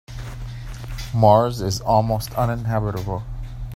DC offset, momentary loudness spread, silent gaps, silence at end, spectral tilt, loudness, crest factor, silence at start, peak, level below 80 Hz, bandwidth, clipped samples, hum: under 0.1%; 19 LU; none; 0 s; -6.5 dB/octave; -20 LUFS; 20 dB; 0.1 s; 0 dBFS; -36 dBFS; 16 kHz; under 0.1%; none